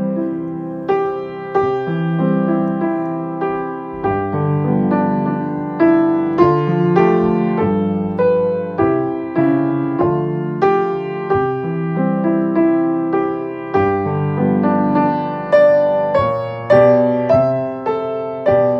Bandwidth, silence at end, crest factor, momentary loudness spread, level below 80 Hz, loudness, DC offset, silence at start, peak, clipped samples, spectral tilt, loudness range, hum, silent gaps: 5.8 kHz; 0 s; 16 dB; 8 LU; -52 dBFS; -17 LUFS; under 0.1%; 0 s; 0 dBFS; under 0.1%; -10 dB/octave; 5 LU; none; none